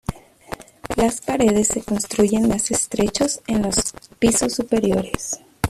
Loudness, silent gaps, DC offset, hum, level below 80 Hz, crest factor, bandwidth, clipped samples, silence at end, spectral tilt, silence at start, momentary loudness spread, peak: -20 LUFS; none; under 0.1%; none; -40 dBFS; 20 dB; 14.5 kHz; under 0.1%; 0 s; -4 dB/octave; 0.1 s; 11 LU; 0 dBFS